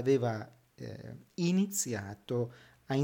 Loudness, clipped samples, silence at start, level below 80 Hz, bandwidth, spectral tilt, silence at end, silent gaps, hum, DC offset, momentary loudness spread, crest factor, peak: -33 LUFS; under 0.1%; 0 s; -72 dBFS; 18.5 kHz; -5.5 dB/octave; 0 s; none; none; under 0.1%; 17 LU; 16 dB; -16 dBFS